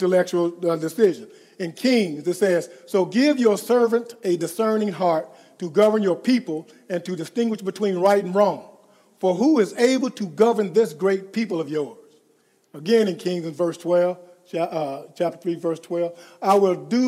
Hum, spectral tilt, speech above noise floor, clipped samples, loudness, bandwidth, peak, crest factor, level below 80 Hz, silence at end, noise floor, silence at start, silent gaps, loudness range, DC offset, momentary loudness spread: none; -5.5 dB/octave; 41 dB; under 0.1%; -22 LUFS; 15.5 kHz; -2 dBFS; 18 dB; -84 dBFS; 0 s; -62 dBFS; 0 s; none; 4 LU; under 0.1%; 10 LU